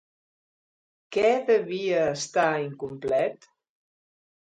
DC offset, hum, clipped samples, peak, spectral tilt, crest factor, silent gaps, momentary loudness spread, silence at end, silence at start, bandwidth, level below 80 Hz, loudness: under 0.1%; none; under 0.1%; -10 dBFS; -4.5 dB/octave; 18 dB; none; 8 LU; 1.15 s; 1.1 s; 9.4 kHz; -68 dBFS; -25 LUFS